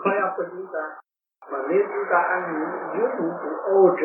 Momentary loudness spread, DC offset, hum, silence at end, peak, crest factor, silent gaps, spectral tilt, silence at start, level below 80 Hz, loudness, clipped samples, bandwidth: 11 LU; under 0.1%; none; 0 s; -4 dBFS; 20 dB; none; -11 dB/octave; 0 s; -88 dBFS; -24 LUFS; under 0.1%; 3 kHz